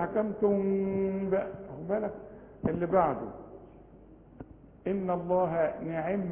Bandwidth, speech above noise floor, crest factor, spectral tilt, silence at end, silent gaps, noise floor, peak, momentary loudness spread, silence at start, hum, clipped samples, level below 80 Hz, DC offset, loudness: 3.5 kHz; 24 dB; 18 dB; -8.5 dB/octave; 0 s; none; -54 dBFS; -12 dBFS; 22 LU; 0 s; none; under 0.1%; -56 dBFS; under 0.1%; -31 LUFS